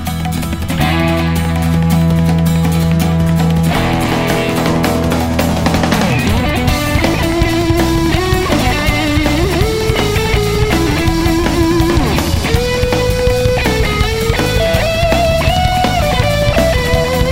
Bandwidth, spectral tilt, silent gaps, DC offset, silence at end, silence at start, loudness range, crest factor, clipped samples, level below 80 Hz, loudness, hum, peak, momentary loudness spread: 16.5 kHz; -5.5 dB/octave; none; under 0.1%; 0 s; 0 s; 1 LU; 12 dB; under 0.1%; -20 dBFS; -13 LUFS; none; 0 dBFS; 2 LU